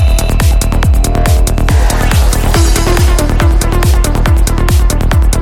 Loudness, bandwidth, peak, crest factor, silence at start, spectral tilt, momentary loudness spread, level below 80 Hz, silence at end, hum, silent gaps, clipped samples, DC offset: -11 LUFS; 17 kHz; 0 dBFS; 8 dB; 0 s; -5 dB/octave; 1 LU; -10 dBFS; 0 s; none; none; under 0.1%; under 0.1%